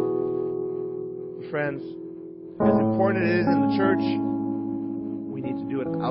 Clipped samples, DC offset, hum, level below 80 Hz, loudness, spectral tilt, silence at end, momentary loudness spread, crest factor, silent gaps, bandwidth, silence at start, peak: under 0.1%; under 0.1%; none; -58 dBFS; -25 LUFS; -11.5 dB/octave; 0 s; 14 LU; 18 dB; none; 5.8 kHz; 0 s; -8 dBFS